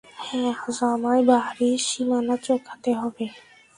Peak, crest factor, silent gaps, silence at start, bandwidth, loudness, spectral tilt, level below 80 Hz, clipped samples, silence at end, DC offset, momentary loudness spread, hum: -4 dBFS; 18 dB; none; 0.15 s; 11.5 kHz; -23 LUFS; -3.5 dB/octave; -66 dBFS; under 0.1%; 0.35 s; under 0.1%; 10 LU; none